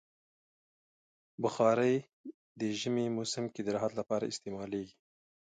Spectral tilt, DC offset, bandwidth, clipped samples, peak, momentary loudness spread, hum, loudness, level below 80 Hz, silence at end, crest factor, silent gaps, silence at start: -5 dB/octave; under 0.1%; 9.4 kHz; under 0.1%; -16 dBFS; 15 LU; none; -34 LUFS; -74 dBFS; 0.7 s; 20 dB; 2.13-2.24 s, 2.34-2.55 s; 1.4 s